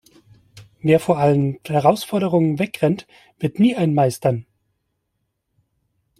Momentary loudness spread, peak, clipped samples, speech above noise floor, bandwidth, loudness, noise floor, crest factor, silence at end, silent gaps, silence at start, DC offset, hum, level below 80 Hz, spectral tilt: 9 LU; -2 dBFS; under 0.1%; 56 dB; 15 kHz; -19 LUFS; -74 dBFS; 18 dB; 1.8 s; none; 0.55 s; under 0.1%; none; -58 dBFS; -7 dB/octave